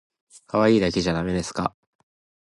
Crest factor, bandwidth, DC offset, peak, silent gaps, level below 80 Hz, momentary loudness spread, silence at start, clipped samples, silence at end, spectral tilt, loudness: 20 dB; 11.5 kHz; under 0.1%; -6 dBFS; none; -46 dBFS; 10 LU; 0.55 s; under 0.1%; 0.8 s; -5.5 dB/octave; -23 LUFS